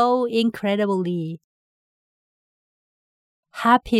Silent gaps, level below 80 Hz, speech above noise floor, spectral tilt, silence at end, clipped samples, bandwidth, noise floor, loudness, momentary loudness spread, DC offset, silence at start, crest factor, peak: 1.44-3.43 s; -54 dBFS; over 70 dB; -6.5 dB/octave; 0 s; under 0.1%; 15 kHz; under -90 dBFS; -22 LUFS; 16 LU; under 0.1%; 0 s; 20 dB; -4 dBFS